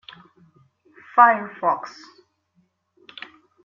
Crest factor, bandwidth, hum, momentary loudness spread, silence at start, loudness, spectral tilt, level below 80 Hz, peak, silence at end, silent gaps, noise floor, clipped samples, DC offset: 22 dB; 7.2 kHz; none; 26 LU; 1.15 s; -19 LUFS; -5 dB/octave; -78 dBFS; -2 dBFS; 1.75 s; none; -67 dBFS; under 0.1%; under 0.1%